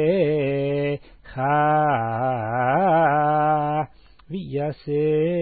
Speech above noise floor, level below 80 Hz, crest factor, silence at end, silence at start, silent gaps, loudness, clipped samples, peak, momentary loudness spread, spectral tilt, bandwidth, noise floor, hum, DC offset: 21 dB; -54 dBFS; 14 dB; 0 s; 0 s; none; -21 LUFS; under 0.1%; -8 dBFS; 11 LU; -12 dB/octave; 4.8 kHz; -41 dBFS; none; 0.2%